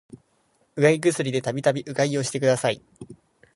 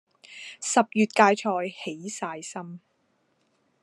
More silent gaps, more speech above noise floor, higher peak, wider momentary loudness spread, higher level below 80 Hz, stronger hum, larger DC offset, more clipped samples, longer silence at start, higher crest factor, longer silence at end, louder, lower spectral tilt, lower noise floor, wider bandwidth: neither; about the same, 43 dB vs 45 dB; about the same, -4 dBFS vs -2 dBFS; second, 7 LU vs 22 LU; first, -66 dBFS vs -86 dBFS; neither; neither; neither; first, 0.75 s vs 0.3 s; second, 20 dB vs 26 dB; second, 0.4 s vs 1.05 s; about the same, -23 LUFS vs -25 LUFS; first, -5 dB/octave vs -3.5 dB/octave; second, -66 dBFS vs -70 dBFS; about the same, 11.5 kHz vs 12 kHz